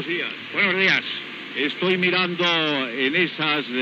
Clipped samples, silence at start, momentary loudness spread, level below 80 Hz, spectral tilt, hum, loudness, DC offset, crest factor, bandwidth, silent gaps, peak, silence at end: under 0.1%; 0 s; 8 LU; -80 dBFS; -5 dB/octave; none; -21 LUFS; under 0.1%; 18 dB; 7.6 kHz; none; -6 dBFS; 0 s